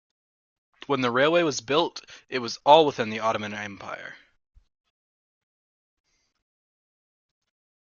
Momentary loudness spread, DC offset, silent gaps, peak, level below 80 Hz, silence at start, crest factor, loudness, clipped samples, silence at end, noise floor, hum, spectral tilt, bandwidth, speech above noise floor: 19 LU; under 0.1%; none; -2 dBFS; -68 dBFS; 0.9 s; 26 dB; -23 LUFS; under 0.1%; 3.7 s; under -90 dBFS; none; -4 dB/octave; 7.4 kHz; over 66 dB